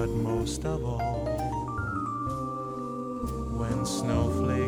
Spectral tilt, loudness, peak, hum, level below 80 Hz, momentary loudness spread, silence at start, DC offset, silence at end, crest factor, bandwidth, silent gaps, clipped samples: -6.5 dB/octave; -31 LUFS; -16 dBFS; none; -40 dBFS; 7 LU; 0 s; under 0.1%; 0 s; 14 dB; 16.5 kHz; none; under 0.1%